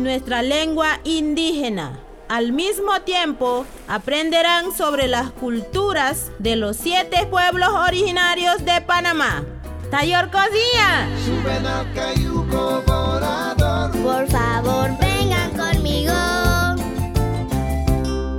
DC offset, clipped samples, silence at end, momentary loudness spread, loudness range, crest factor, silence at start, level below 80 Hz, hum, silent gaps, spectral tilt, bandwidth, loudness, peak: under 0.1%; under 0.1%; 0 s; 7 LU; 3 LU; 16 dB; 0 s; -30 dBFS; none; none; -4.5 dB/octave; 18 kHz; -19 LUFS; -2 dBFS